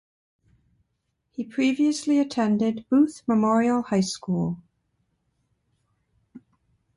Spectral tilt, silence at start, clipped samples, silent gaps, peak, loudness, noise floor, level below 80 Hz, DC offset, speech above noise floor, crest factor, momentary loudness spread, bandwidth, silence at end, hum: -6 dB/octave; 1.4 s; under 0.1%; none; -10 dBFS; -23 LUFS; -76 dBFS; -64 dBFS; under 0.1%; 54 dB; 16 dB; 10 LU; 11.5 kHz; 0.6 s; none